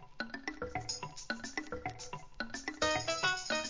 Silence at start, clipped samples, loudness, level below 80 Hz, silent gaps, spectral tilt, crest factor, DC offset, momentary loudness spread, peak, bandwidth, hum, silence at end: 0 s; under 0.1%; -38 LUFS; -58 dBFS; none; -2.5 dB/octave; 20 dB; 0.1%; 11 LU; -20 dBFS; 7.8 kHz; none; 0 s